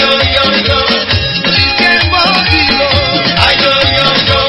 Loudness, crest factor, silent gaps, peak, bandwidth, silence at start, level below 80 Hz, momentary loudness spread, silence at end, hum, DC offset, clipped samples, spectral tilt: -8 LUFS; 10 dB; none; 0 dBFS; 11 kHz; 0 s; -26 dBFS; 3 LU; 0 s; none; under 0.1%; 0.3%; -5.5 dB/octave